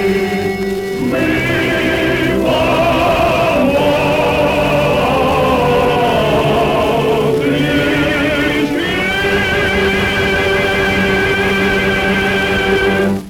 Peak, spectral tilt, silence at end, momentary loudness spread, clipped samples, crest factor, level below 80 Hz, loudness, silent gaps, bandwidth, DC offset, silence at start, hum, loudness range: -4 dBFS; -5.5 dB/octave; 0 s; 2 LU; under 0.1%; 10 dB; -32 dBFS; -13 LUFS; none; 18.5 kHz; under 0.1%; 0 s; none; 1 LU